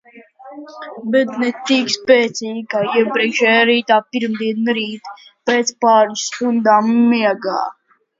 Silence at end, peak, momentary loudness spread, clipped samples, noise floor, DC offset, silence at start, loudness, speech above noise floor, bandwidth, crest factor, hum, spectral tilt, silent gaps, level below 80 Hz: 0.45 s; 0 dBFS; 14 LU; under 0.1%; -40 dBFS; under 0.1%; 0.15 s; -16 LUFS; 25 dB; 7.8 kHz; 16 dB; none; -3.5 dB/octave; none; -70 dBFS